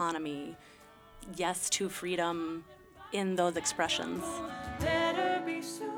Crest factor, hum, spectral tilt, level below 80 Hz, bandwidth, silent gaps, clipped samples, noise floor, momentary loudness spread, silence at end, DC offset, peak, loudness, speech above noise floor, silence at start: 20 dB; none; -3 dB/octave; -58 dBFS; over 20 kHz; none; under 0.1%; -55 dBFS; 14 LU; 0 s; under 0.1%; -16 dBFS; -33 LUFS; 22 dB; 0 s